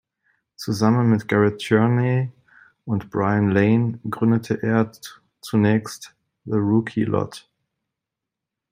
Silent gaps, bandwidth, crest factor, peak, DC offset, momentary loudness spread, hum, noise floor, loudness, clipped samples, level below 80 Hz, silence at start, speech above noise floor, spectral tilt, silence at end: none; 15.5 kHz; 18 dB; -2 dBFS; under 0.1%; 17 LU; none; -85 dBFS; -21 LUFS; under 0.1%; -62 dBFS; 0.6 s; 65 dB; -7.5 dB/octave; 1.35 s